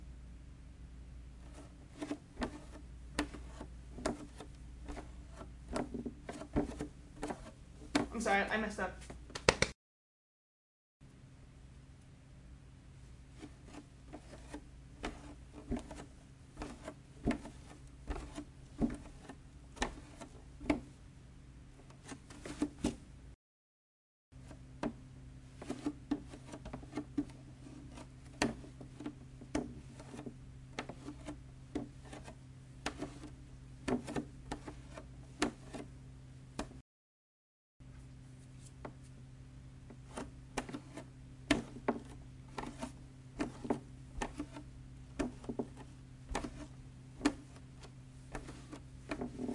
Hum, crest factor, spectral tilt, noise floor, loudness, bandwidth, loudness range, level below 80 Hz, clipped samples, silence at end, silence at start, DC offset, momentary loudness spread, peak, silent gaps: none; 38 dB; -4.5 dB/octave; under -90 dBFS; -43 LUFS; 11.5 kHz; 14 LU; -54 dBFS; under 0.1%; 0 s; 0 s; under 0.1%; 18 LU; -6 dBFS; 9.75-11.00 s, 23.35-24.32 s, 36.81-37.80 s